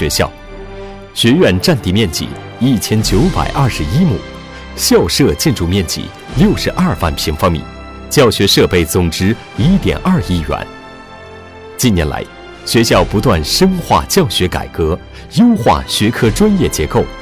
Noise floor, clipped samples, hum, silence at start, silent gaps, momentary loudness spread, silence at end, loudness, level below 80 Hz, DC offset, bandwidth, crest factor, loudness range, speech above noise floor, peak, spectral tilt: -33 dBFS; under 0.1%; none; 0 s; none; 19 LU; 0 s; -13 LUFS; -26 dBFS; 0.4%; 16 kHz; 14 dB; 3 LU; 21 dB; 0 dBFS; -5 dB/octave